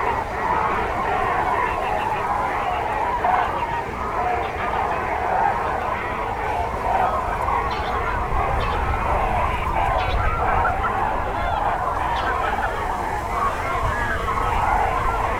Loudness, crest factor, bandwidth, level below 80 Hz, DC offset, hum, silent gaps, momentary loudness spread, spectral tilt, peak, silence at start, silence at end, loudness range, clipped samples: -22 LUFS; 16 dB; over 20 kHz; -30 dBFS; under 0.1%; none; none; 4 LU; -5.5 dB/octave; -6 dBFS; 0 s; 0 s; 1 LU; under 0.1%